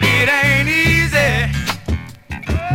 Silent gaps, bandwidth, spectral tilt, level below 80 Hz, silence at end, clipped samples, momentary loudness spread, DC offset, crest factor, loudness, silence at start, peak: none; 16.5 kHz; -4.5 dB/octave; -28 dBFS; 0 s; under 0.1%; 13 LU; under 0.1%; 14 dB; -15 LUFS; 0 s; -2 dBFS